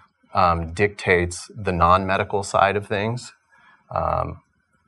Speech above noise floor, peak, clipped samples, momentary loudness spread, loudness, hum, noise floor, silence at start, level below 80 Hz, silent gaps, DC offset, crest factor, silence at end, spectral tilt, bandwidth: 35 dB; -2 dBFS; under 0.1%; 11 LU; -21 LUFS; none; -56 dBFS; 0.35 s; -42 dBFS; none; under 0.1%; 22 dB; 0.5 s; -5.5 dB/octave; 12 kHz